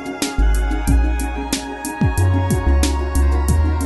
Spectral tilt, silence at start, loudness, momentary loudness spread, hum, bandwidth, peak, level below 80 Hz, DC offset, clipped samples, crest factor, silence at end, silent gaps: -5.5 dB/octave; 0 s; -19 LUFS; 6 LU; none; 12 kHz; -4 dBFS; -18 dBFS; under 0.1%; under 0.1%; 12 dB; 0 s; none